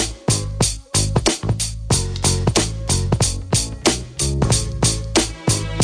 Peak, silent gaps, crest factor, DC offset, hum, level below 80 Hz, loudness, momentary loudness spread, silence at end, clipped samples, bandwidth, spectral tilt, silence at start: -2 dBFS; none; 18 dB; under 0.1%; none; -28 dBFS; -19 LUFS; 4 LU; 0 s; under 0.1%; 11 kHz; -3.5 dB/octave; 0 s